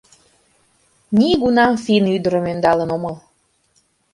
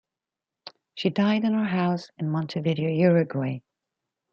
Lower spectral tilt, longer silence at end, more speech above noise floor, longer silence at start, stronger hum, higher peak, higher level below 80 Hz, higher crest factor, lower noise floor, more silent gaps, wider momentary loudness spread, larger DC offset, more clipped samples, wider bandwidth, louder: second, -6.5 dB/octave vs -8.5 dB/octave; first, 0.95 s vs 0.75 s; second, 46 dB vs 65 dB; first, 1.1 s vs 0.65 s; neither; first, -2 dBFS vs -8 dBFS; first, -50 dBFS vs -70 dBFS; about the same, 18 dB vs 18 dB; second, -62 dBFS vs -89 dBFS; neither; about the same, 10 LU vs 9 LU; neither; neither; first, 11.5 kHz vs 7 kHz; first, -17 LUFS vs -25 LUFS